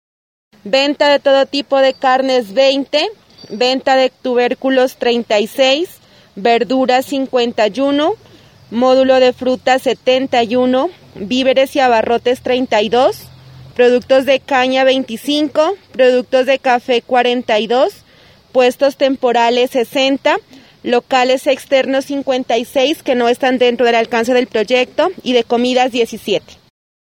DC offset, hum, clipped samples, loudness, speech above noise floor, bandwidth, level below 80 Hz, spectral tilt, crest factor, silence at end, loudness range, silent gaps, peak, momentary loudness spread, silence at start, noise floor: under 0.1%; none; under 0.1%; -14 LUFS; 33 dB; 16.5 kHz; -56 dBFS; -3.5 dB/octave; 14 dB; 0.8 s; 1 LU; none; 0 dBFS; 5 LU; 0.65 s; -46 dBFS